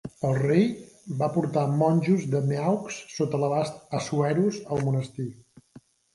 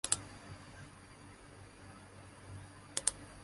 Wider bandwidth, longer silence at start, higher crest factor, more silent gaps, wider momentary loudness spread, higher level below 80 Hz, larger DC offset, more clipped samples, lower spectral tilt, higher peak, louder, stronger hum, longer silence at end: about the same, 11.5 kHz vs 11.5 kHz; about the same, 0.05 s vs 0.05 s; second, 18 dB vs 32 dB; neither; second, 11 LU vs 20 LU; about the same, -62 dBFS vs -62 dBFS; neither; neither; first, -7 dB/octave vs -1.5 dB/octave; first, -8 dBFS vs -12 dBFS; first, -26 LUFS vs -40 LUFS; neither; first, 0.8 s vs 0 s